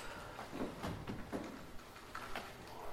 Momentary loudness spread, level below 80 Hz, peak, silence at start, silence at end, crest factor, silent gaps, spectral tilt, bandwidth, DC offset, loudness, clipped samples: 8 LU; -58 dBFS; -28 dBFS; 0 s; 0 s; 18 dB; none; -5 dB/octave; 16 kHz; under 0.1%; -47 LUFS; under 0.1%